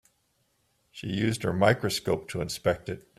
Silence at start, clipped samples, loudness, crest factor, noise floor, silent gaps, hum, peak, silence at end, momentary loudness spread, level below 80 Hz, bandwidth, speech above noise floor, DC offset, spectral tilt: 0.95 s; under 0.1%; -28 LUFS; 22 dB; -72 dBFS; none; none; -6 dBFS; 0.2 s; 10 LU; -56 dBFS; 15.5 kHz; 44 dB; under 0.1%; -5 dB/octave